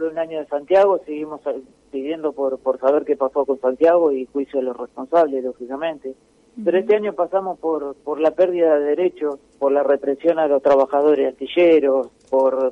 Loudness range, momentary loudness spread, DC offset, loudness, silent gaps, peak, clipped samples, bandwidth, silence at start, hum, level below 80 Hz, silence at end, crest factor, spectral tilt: 4 LU; 12 LU; under 0.1%; -19 LUFS; none; -4 dBFS; under 0.1%; 6.8 kHz; 0 s; none; -64 dBFS; 0 s; 14 dB; -6.5 dB/octave